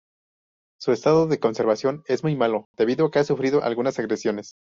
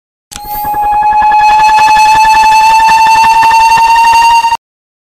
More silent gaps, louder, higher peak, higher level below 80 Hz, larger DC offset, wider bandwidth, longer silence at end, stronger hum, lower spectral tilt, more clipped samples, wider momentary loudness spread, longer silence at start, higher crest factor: first, 2.65-2.74 s vs none; second, -23 LUFS vs -5 LUFS; second, -6 dBFS vs -2 dBFS; second, -64 dBFS vs -34 dBFS; neither; second, 7.6 kHz vs 15.5 kHz; second, 0.2 s vs 0.45 s; neither; first, -5.5 dB/octave vs -0.5 dB/octave; neither; second, 6 LU vs 9 LU; first, 0.8 s vs 0.3 s; first, 16 dB vs 4 dB